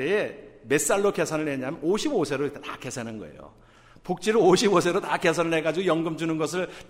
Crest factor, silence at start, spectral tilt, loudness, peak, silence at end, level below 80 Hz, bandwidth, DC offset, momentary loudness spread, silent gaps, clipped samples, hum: 18 dB; 0 s; -4.5 dB/octave; -25 LUFS; -8 dBFS; 0.05 s; -58 dBFS; 16 kHz; under 0.1%; 15 LU; none; under 0.1%; none